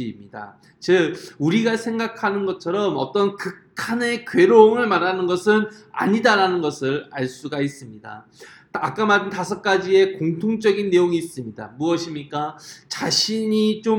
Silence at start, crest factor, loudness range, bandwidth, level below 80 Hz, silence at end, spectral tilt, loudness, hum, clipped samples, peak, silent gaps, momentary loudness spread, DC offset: 0 s; 20 dB; 5 LU; 17 kHz; -66 dBFS; 0 s; -5 dB/octave; -20 LUFS; none; under 0.1%; 0 dBFS; none; 15 LU; under 0.1%